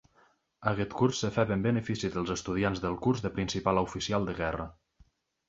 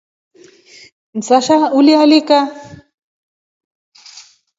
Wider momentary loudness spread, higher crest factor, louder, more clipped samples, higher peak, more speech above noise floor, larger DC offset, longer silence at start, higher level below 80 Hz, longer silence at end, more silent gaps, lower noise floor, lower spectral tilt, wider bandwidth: second, 5 LU vs 15 LU; first, 22 dB vs 16 dB; second, -31 LUFS vs -11 LUFS; neither; second, -10 dBFS vs 0 dBFS; first, 37 dB vs 32 dB; neither; second, 0.6 s vs 1.15 s; first, -52 dBFS vs -62 dBFS; second, 0.75 s vs 1.85 s; neither; first, -67 dBFS vs -43 dBFS; first, -5.5 dB/octave vs -4 dB/octave; about the same, 8 kHz vs 7.8 kHz